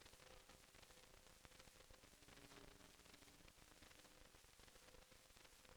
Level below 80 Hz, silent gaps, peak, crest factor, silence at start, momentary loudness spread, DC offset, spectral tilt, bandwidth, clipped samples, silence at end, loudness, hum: -74 dBFS; none; -40 dBFS; 28 dB; 0 s; 3 LU; under 0.1%; -2.5 dB/octave; over 20 kHz; under 0.1%; 0 s; -66 LUFS; none